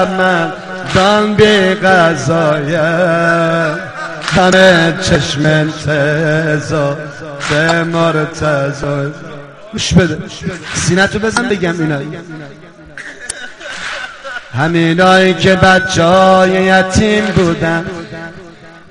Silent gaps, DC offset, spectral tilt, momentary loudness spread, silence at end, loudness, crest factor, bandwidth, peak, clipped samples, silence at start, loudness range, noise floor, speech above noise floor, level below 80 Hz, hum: none; under 0.1%; -5 dB/octave; 16 LU; 0.1 s; -11 LUFS; 12 dB; 10.5 kHz; 0 dBFS; 0.2%; 0 s; 7 LU; -35 dBFS; 24 dB; -36 dBFS; none